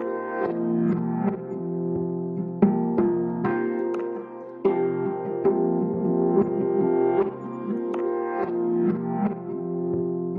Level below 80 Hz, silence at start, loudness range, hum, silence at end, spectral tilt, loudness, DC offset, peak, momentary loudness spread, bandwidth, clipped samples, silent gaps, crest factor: -62 dBFS; 0 s; 2 LU; none; 0 s; -11.5 dB/octave; -25 LUFS; under 0.1%; -6 dBFS; 8 LU; 3.7 kHz; under 0.1%; none; 18 dB